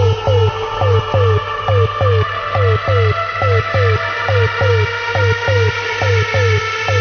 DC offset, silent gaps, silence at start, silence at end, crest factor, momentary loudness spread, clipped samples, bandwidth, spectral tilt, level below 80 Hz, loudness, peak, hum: under 0.1%; none; 0 s; 0 s; 12 dB; 3 LU; under 0.1%; 6.6 kHz; -5.5 dB/octave; -30 dBFS; -15 LUFS; -2 dBFS; none